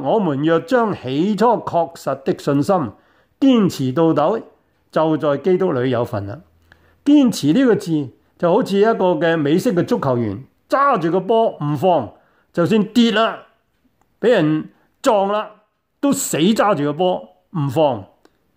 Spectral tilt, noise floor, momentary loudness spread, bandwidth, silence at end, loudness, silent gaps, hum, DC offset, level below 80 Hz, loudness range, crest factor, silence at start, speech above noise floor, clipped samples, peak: -6 dB/octave; -62 dBFS; 9 LU; 16 kHz; 0.5 s; -17 LUFS; none; none; under 0.1%; -60 dBFS; 2 LU; 14 dB; 0 s; 46 dB; under 0.1%; -4 dBFS